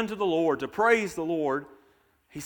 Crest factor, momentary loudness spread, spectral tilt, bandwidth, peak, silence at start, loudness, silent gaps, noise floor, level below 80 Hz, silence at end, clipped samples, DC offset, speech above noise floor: 20 dB; 8 LU; -5 dB/octave; 19 kHz; -8 dBFS; 0 s; -26 LUFS; none; -64 dBFS; -64 dBFS; 0 s; under 0.1%; under 0.1%; 38 dB